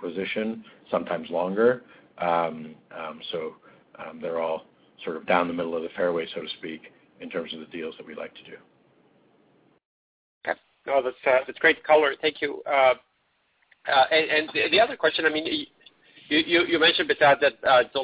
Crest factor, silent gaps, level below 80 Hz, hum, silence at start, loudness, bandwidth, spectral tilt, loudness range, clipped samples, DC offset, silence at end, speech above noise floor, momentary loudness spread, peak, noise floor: 20 dB; 9.85-10.41 s; -66 dBFS; none; 0 s; -24 LUFS; 4 kHz; -7.5 dB/octave; 16 LU; under 0.1%; under 0.1%; 0 s; 45 dB; 19 LU; -6 dBFS; -70 dBFS